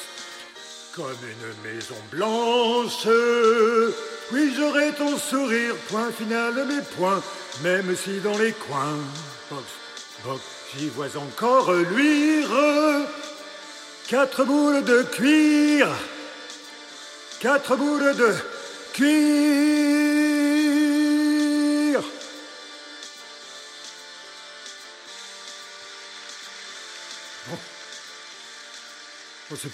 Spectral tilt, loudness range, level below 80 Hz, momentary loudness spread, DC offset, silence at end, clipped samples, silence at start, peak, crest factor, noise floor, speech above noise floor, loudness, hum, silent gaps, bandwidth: -4 dB/octave; 17 LU; -76 dBFS; 20 LU; under 0.1%; 0 s; under 0.1%; 0 s; -6 dBFS; 18 dB; -43 dBFS; 21 dB; -22 LUFS; none; none; 15 kHz